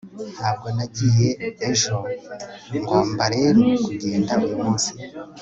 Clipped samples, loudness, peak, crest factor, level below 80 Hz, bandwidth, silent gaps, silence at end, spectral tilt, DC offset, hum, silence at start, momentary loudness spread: under 0.1%; -21 LUFS; -4 dBFS; 18 dB; -54 dBFS; 8.2 kHz; none; 0 s; -5 dB/octave; under 0.1%; none; 0.05 s; 15 LU